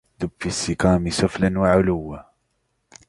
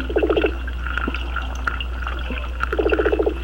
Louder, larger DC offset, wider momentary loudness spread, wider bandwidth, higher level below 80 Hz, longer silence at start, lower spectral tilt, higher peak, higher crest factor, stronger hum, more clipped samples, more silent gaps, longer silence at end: about the same, -21 LUFS vs -23 LUFS; second, under 0.1% vs 0.4%; first, 13 LU vs 8 LU; second, 11.5 kHz vs 16.5 kHz; second, -40 dBFS vs -26 dBFS; first, 0.2 s vs 0 s; second, -5.5 dB/octave vs -7 dB/octave; first, -2 dBFS vs -6 dBFS; about the same, 20 dB vs 16 dB; neither; neither; neither; first, 0.85 s vs 0 s